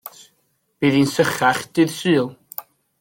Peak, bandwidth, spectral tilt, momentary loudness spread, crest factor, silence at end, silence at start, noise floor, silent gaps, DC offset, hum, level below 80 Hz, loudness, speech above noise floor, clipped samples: -4 dBFS; 17 kHz; -5 dB/octave; 17 LU; 18 dB; 0.4 s; 0.05 s; -67 dBFS; none; under 0.1%; none; -60 dBFS; -19 LUFS; 49 dB; under 0.1%